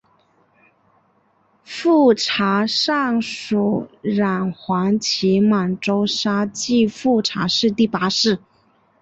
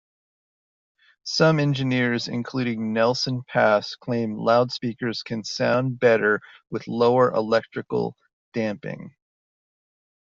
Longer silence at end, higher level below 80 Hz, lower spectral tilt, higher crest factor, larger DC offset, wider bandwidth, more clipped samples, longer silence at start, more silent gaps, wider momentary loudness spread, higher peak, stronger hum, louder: second, 0.65 s vs 1.25 s; first, -60 dBFS vs -66 dBFS; second, -4.5 dB/octave vs -6 dB/octave; about the same, 16 dB vs 20 dB; neither; about the same, 8.2 kHz vs 7.6 kHz; neither; first, 1.7 s vs 1.25 s; second, none vs 8.33-8.52 s; second, 7 LU vs 11 LU; about the same, -4 dBFS vs -4 dBFS; neither; first, -18 LUFS vs -23 LUFS